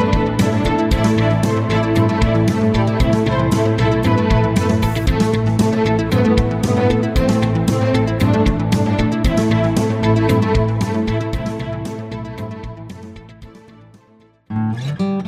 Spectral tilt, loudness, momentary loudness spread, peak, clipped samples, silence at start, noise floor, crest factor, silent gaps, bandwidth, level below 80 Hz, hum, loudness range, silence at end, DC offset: -7 dB/octave; -17 LUFS; 11 LU; -2 dBFS; under 0.1%; 0 s; -51 dBFS; 14 dB; none; 15 kHz; -28 dBFS; none; 10 LU; 0 s; under 0.1%